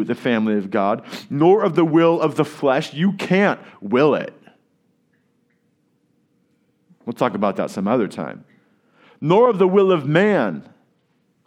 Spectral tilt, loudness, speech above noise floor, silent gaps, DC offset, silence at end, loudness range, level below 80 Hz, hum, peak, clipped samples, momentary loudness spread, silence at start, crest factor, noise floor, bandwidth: -7.5 dB/octave; -18 LUFS; 47 dB; none; under 0.1%; 0.85 s; 9 LU; -74 dBFS; none; -2 dBFS; under 0.1%; 13 LU; 0 s; 18 dB; -65 dBFS; 13 kHz